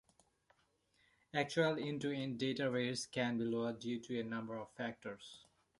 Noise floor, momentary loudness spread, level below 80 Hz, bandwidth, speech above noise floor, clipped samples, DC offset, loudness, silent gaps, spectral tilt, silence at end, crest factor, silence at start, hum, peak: -77 dBFS; 13 LU; -78 dBFS; 11.5 kHz; 38 dB; under 0.1%; under 0.1%; -40 LUFS; none; -5 dB/octave; 0.4 s; 22 dB; 1.35 s; none; -20 dBFS